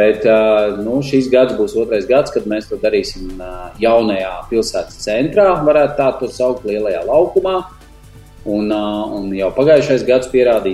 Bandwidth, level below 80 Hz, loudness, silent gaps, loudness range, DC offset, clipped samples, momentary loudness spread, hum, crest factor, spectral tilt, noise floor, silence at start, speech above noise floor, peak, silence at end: 12.5 kHz; -38 dBFS; -15 LUFS; none; 3 LU; under 0.1%; under 0.1%; 10 LU; none; 14 dB; -5.5 dB/octave; -39 dBFS; 0 s; 25 dB; 0 dBFS; 0 s